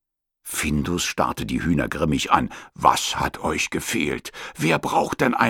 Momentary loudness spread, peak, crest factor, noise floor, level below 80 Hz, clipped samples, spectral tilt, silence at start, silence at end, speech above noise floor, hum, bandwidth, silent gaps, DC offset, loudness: 7 LU; -2 dBFS; 22 dB; -44 dBFS; -42 dBFS; under 0.1%; -4 dB/octave; 0.45 s; 0 s; 22 dB; none; 18.5 kHz; none; under 0.1%; -23 LUFS